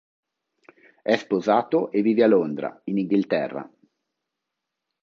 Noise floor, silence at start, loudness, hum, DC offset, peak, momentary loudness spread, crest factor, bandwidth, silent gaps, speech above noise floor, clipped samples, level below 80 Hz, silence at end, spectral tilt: -83 dBFS; 1.05 s; -23 LUFS; none; under 0.1%; -4 dBFS; 12 LU; 22 dB; 7.2 kHz; none; 61 dB; under 0.1%; -74 dBFS; 1.35 s; -7.5 dB/octave